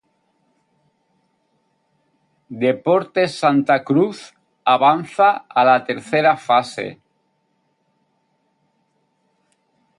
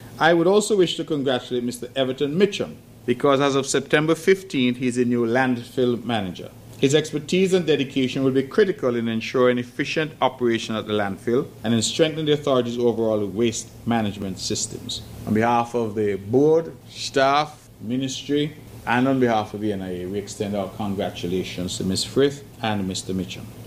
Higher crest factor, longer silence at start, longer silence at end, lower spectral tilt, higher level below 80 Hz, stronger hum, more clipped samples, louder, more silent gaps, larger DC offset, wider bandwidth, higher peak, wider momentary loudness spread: about the same, 20 dB vs 18 dB; first, 2.5 s vs 0 s; first, 3.05 s vs 0 s; about the same, -6 dB/octave vs -5 dB/octave; second, -70 dBFS vs -54 dBFS; neither; neither; first, -17 LUFS vs -22 LUFS; neither; neither; second, 11.5 kHz vs 16 kHz; about the same, -2 dBFS vs -4 dBFS; about the same, 11 LU vs 10 LU